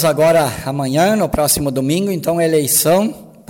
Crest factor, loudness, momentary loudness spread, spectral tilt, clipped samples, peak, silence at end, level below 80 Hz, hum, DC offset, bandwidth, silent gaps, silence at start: 12 dB; -15 LUFS; 6 LU; -4.5 dB/octave; under 0.1%; -2 dBFS; 0.25 s; -40 dBFS; none; under 0.1%; 17 kHz; none; 0 s